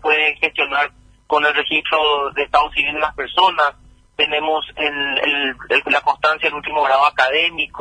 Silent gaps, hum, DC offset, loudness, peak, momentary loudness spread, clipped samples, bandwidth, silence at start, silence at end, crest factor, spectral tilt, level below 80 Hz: none; none; under 0.1%; -17 LUFS; 0 dBFS; 6 LU; under 0.1%; 10 kHz; 0 s; 0 s; 18 dB; -3 dB/octave; -48 dBFS